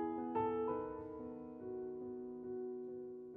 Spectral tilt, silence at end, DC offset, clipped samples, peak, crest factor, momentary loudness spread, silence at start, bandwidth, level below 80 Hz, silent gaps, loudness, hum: -7.5 dB/octave; 0 s; under 0.1%; under 0.1%; -26 dBFS; 16 dB; 10 LU; 0 s; 3.8 kHz; -72 dBFS; none; -44 LUFS; none